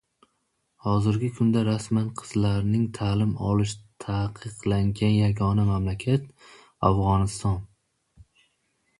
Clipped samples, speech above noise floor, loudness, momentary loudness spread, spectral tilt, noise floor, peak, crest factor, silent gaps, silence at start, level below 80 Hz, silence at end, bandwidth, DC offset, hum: under 0.1%; 50 dB; -25 LUFS; 8 LU; -7 dB/octave; -74 dBFS; -6 dBFS; 20 dB; none; 0.85 s; -44 dBFS; 1.35 s; 11.5 kHz; under 0.1%; none